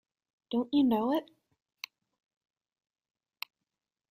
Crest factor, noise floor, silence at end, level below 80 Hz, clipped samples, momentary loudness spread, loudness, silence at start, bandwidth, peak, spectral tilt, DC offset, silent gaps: 20 dB; -90 dBFS; 2.9 s; -76 dBFS; under 0.1%; 19 LU; -30 LUFS; 0.5 s; 15.5 kHz; -16 dBFS; -6 dB/octave; under 0.1%; none